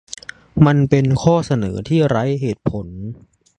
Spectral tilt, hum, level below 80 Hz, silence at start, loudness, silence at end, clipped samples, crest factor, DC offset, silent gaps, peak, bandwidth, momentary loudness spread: -7.5 dB/octave; none; -42 dBFS; 0.55 s; -17 LUFS; 0.45 s; under 0.1%; 18 dB; under 0.1%; none; 0 dBFS; 9.6 kHz; 18 LU